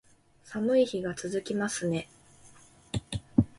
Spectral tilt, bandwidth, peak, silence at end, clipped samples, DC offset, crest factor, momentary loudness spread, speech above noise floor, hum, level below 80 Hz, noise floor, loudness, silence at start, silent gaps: -5.5 dB/octave; 11.5 kHz; -8 dBFS; 0.1 s; under 0.1%; under 0.1%; 22 dB; 12 LU; 29 dB; none; -52 dBFS; -58 dBFS; -30 LUFS; 0.45 s; none